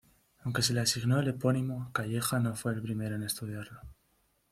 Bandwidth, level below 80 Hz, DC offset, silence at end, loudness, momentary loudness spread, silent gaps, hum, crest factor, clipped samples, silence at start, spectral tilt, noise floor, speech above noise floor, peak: 15.5 kHz; -62 dBFS; under 0.1%; 0.6 s; -32 LUFS; 13 LU; none; none; 18 dB; under 0.1%; 0.45 s; -4.5 dB/octave; -72 dBFS; 41 dB; -14 dBFS